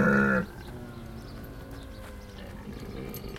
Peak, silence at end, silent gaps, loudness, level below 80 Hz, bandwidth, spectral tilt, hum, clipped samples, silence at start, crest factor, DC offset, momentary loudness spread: -12 dBFS; 0 s; none; -32 LUFS; -46 dBFS; 16 kHz; -7 dB/octave; none; under 0.1%; 0 s; 18 dB; under 0.1%; 19 LU